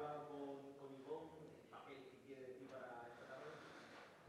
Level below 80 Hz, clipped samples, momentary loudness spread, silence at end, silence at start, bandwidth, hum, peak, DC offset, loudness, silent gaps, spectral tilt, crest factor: under -90 dBFS; under 0.1%; 8 LU; 0 s; 0 s; 13 kHz; none; -38 dBFS; under 0.1%; -56 LUFS; none; -5.5 dB/octave; 18 dB